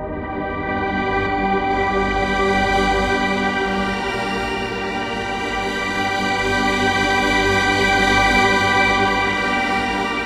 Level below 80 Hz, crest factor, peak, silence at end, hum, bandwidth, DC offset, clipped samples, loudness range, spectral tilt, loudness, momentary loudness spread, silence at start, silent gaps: -34 dBFS; 16 dB; -4 dBFS; 0 s; none; 15 kHz; under 0.1%; under 0.1%; 5 LU; -4 dB/octave; -18 LUFS; 8 LU; 0 s; none